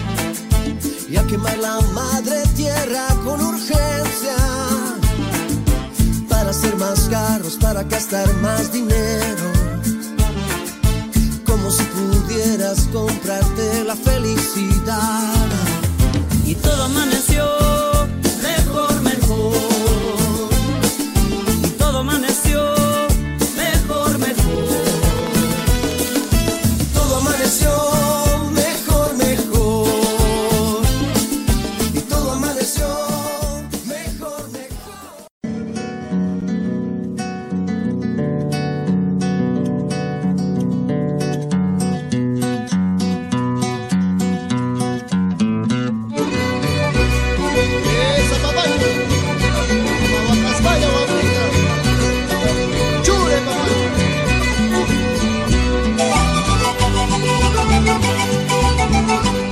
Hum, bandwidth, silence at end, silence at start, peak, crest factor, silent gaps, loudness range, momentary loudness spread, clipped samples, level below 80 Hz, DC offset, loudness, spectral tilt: none; 16.5 kHz; 0 s; 0 s; -2 dBFS; 14 dB; 35.31-35.41 s; 5 LU; 6 LU; under 0.1%; -24 dBFS; under 0.1%; -18 LUFS; -4.5 dB/octave